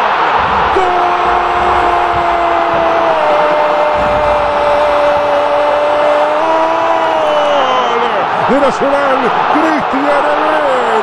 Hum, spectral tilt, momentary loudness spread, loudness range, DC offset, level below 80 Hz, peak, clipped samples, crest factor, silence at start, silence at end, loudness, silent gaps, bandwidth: none; -4.5 dB/octave; 1 LU; 0 LU; under 0.1%; -36 dBFS; 0 dBFS; under 0.1%; 10 dB; 0 s; 0 s; -11 LUFS; none; 11.5 kHz